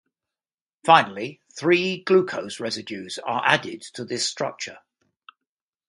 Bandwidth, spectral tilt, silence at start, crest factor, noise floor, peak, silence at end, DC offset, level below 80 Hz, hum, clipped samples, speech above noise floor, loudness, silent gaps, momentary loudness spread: 11.5 kHz; -3.5 dB/octave; 0.85 s; 24 dB; under -90 dBFS; 0 dBFS; 1.1 s; under 0.1%; -72 dBFS; none; under 0.1%; over 67 dB; -22 LUFS; none; 17 LU